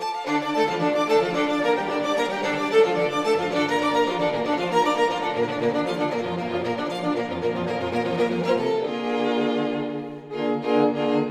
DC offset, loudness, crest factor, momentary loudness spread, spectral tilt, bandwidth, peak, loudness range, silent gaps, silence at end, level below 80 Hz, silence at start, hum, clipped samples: under 0.1%; -23 LUFS; 16 dB; 6 LU; -5.5 dB/octave; 13.5 kHz; -6 dBFS; 3 LU; none; 0 s; -64 dBFS; 0 s; none; under 0.1%